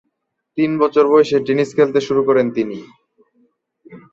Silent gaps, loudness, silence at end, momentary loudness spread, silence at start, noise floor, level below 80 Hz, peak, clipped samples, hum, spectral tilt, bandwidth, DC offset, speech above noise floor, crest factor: none; -16 LUFS; 0.15 s; 11 LU; 0.55 s; -73 dBFS; -62 dBFS; -2 dBFS; under 0.1%; none; -6.5 dB/octave; 7.8 kHz; under 0.1%; 58 dB; 16 dB